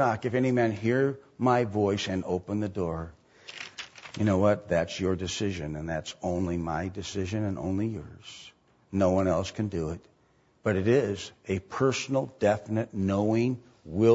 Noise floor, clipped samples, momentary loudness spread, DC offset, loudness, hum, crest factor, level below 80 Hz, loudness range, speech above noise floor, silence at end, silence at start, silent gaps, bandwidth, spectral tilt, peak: -65 dBFS; under 0.1%; 15 LU; under 0.1%; -29 LUFS; none; 18 dB; -54 dBFS; 3 LU; 38 dB; 0 s; 0 s; none; 8 kHz; -6.5 dB/octave; -10 dBFS